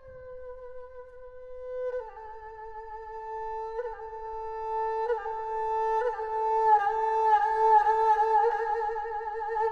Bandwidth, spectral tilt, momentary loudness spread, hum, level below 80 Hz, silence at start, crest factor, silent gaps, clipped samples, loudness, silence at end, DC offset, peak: 7 kHz; -3.5 dB/octave; 21 LU; none; -54 dBFS; 0 s; 16 dB; none; under 0.1%; -27 LUFS; 0 s; under 0.1%; -12 dBFS